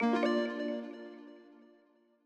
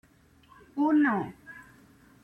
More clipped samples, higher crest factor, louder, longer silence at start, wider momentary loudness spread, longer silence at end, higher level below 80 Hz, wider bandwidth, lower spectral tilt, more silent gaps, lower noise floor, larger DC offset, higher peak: neither; about the same, 16 dB vs 14 dB; second, -34 LUFS vs -27 LUFS; second, 0 s vs 0.75 s; about the same, 24 LU vs 24 LU; first, 0.75 s vs 0.6 s; second, -84 dBFS vs -68 dBFS; first, 8.6 kHz vs 3.9 kHz; second, -5.5 dB/octave vs -8 dB/octave; neither; first, -68 dBFS vs -59 dBFS; neither; second, -20 dBFS vs -16 dBFS